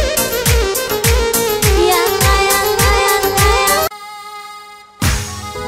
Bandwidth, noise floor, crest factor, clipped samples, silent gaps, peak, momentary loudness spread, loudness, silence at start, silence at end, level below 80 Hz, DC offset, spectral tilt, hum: 16.5 kHz; -36 dBFS; 12 dB; under 0.1%; none; -2 dBFS; 18 LU; -13 LUFS; 0 s; 0 s; -22 dBFS; under 0.1%; -3 dB/octave; none